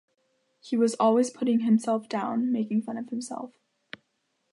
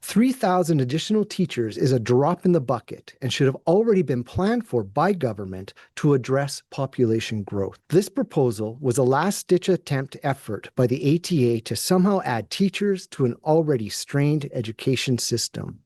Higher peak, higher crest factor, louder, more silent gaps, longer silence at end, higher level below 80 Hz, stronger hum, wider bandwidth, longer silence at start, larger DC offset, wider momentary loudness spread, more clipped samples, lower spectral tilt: second, -12 dBFS vs -6 dBFS; about the same, 16 dB vs 16 dB; second, -26 LUFS vs -23 LUFS; neither; first, 1.05 s vs 0.1 s; second, -82 dBFS vs -60 dBFS; neither; about the same, 11.5 kHz vs 12.5 kHz; first, 0.65 s vs 0.05 s; neither; first, 22 LU vs 8 LU; neither; about the same, -6 dB/octave vs -6 dB/octave